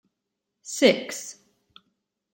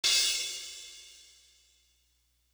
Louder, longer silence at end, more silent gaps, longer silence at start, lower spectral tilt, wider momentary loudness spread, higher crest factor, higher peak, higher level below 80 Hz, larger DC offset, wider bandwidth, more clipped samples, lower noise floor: first, -23 LUFS vs -29 LUFS; second, 1.05 s vs 1.3 s; neither; first, 0.65 s vs 0.05 s; first, -3 dB/octave vs 3.5 dB/octave; second, 20 LU vs 24 LU; about the same, 22 dB vs 22 dB; first, -6 dBFS vs -12 dBFS; second, -76 dBFS vs -68 dBFS; neither; second, 17 kHz vs over 20 kHz; neither; first, -83 dBFS vs -72 dBFS